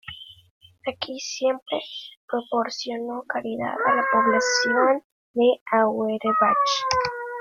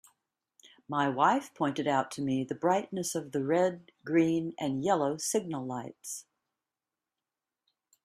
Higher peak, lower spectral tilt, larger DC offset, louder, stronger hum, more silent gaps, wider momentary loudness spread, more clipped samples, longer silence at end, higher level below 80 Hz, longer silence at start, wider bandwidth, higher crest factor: first, -4 dBFS vs -12 dBFS; second, -2.5 dB/octave vs -5 dB/octave; neither; first, -23 LUFS vs -31 LUFS; neither; first, 0.51-0.61 s, 1.62-1.66 s, 2.17-2.28 s, 5.04-5.34 s, 5.61-5.66 s vs none; about the same, 12 LU vs 12 LU; neither; second, 0 s vs 1.85 s; first, -62 dBFS vs -76 dBFS; second, 0.05 s vs 0.9 s; second, 7.4 kHz vs 15 kHz; about the same, 20 dB vs 20 dB